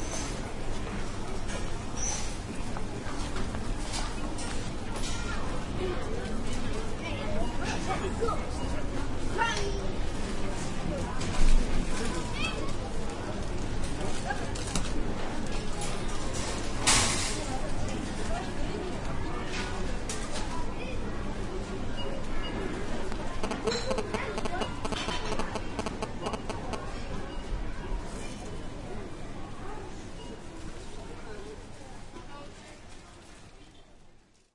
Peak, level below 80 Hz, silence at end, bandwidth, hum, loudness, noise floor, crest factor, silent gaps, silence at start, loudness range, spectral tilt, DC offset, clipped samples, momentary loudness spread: -10 dBFS; -34 dBFS; 0.45 s; 11.5 kHz; none; -34 LUFS; -56 dBFS; 20 dB; none; 0 s; 12 LU; -4 dB/octave; under 0.1%; under 0.1%; 12 LU